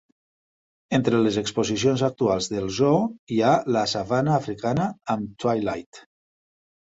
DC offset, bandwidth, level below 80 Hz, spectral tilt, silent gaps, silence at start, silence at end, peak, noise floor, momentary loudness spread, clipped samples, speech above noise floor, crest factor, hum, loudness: under 0.1%; 8 kHz; -56 dBFS; -5.5 dB/octave; 3.19-3.27 s, 5.86-5.92 s; 0.9 s; 0.85 s; -6 dBFS; under -90 dBFS; 6 LU; under 0.1%; over 67 dB; 18 dB; none; -23 LUFS